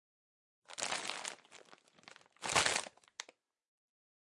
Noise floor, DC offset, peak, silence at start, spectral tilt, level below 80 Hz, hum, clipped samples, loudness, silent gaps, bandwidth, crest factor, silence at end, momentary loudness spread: -63 dBFS; under 0.1%; -14 dBFS; 0.7 s; -0.5 dB/octave; -74 dBFS; none; under 0.1%; -36 LUFS; none; 11.5 kHz; 28 dB; 1 s; 27 LU